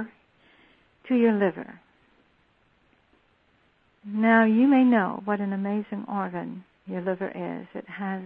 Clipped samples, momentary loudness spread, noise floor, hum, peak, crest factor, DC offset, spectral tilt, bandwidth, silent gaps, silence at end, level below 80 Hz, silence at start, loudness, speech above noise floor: under 0.1%; 20 LU; -65 dBFS; none; -6 dBFS; 20 dB; under 0.1%; -10.5 dB/octave; 4.1 kHz; none; 0 s; -72 dBFS; 0 s; -24 LUFS; 41 dB